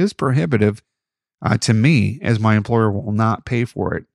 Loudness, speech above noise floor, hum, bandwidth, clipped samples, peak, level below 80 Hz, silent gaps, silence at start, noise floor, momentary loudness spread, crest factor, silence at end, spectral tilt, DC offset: -18 LUFS; 67 dB; none; 11 kHz; under 0.1%; -2 dBFS; -48 dBFS; none; 0 s; -85 dBFS; 7 LU; 16 dB; 0.15 s; -6.5 dB/octave; under 0.1%